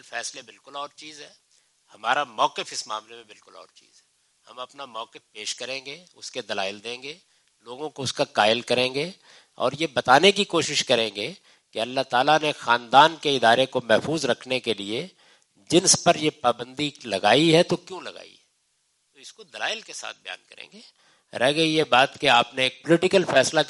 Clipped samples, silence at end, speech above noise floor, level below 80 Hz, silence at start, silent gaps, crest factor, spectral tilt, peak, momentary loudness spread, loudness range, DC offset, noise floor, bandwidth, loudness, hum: under 0.1%; 0 s; 46 dB; -70 dBFS; 0.1 s; none; 24 dB; -3 dB/octave; -2 dBFS; 20 LU; 13 LU; under 0.1%; -70 dBFS; 11.5 kHz; -22 LUFS; none